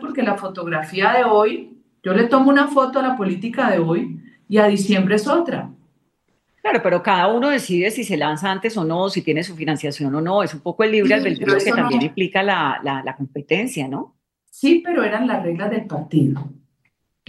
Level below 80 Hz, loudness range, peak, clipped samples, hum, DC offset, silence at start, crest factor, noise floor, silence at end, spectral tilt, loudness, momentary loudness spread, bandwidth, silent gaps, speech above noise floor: -68 dBFS; 4 LU; -2 dBFS; under 0.1%; none; under 0.1%; 0 s; 18 dB; -69 dBFS; 0.75 s; -6 dB/octave; -19 LUFS; 10 LU; 12.5 kHz; none; 50 dB